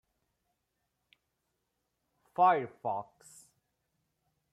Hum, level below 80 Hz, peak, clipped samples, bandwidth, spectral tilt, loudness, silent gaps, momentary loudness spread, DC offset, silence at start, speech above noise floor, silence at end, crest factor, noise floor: none; -84 dBFS; -14 dBFS; under 0.1%; 12.5 kHz; -5.5 dB/octave; -30 LUFS; none; 16 LU; under 0.1%; 2.4 s; 52 dB; 1.5 s; 22 dB; -83 dBFS